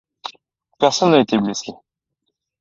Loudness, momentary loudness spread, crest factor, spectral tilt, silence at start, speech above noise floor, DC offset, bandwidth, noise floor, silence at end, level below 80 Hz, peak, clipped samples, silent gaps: -17 LUFS; 20 LU; 20 dB; -4.5 dB/octave; 0.25 s; 60 dB; under 0.1%; 7.8 kHz; -76 dBFS; 0.85 s; -62 dBFS; 0 dBFS; under 0.1%; none